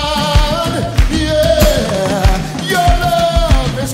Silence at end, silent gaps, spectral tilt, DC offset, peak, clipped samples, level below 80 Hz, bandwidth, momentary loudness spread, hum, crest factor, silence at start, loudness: 0 s; none; -5 dB/octave; under 0.1%; 0 dBFS; under 0.1%; -16 dBFS; 16.5 kHz; 4 LU; none; 12 dB; 0 s; -13 LUFS